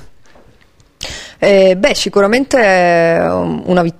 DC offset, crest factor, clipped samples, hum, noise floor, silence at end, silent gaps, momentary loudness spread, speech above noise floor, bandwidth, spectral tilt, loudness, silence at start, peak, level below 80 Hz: under 0.1%; 12 dB; under 0.1%; none; -49 dBFS; 0.1 s; none; 16 LU; 38 dB; 14.5 kHz; -5 dB/octave; -11 LUFS; 0 s; 0 dBFS; -40 dBFS